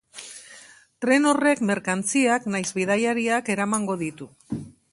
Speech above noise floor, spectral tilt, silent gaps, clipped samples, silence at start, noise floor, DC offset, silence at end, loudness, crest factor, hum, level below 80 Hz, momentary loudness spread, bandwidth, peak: 27 dB; -4 dB/octave; none; under 0.1%; 0.15 s; -49 dBFS; under 0.1%; 0.25 s; -23 LUFS; 18 dB; none; -64 dBFS; 18 LU; 11.5 kHz; -6 dBFS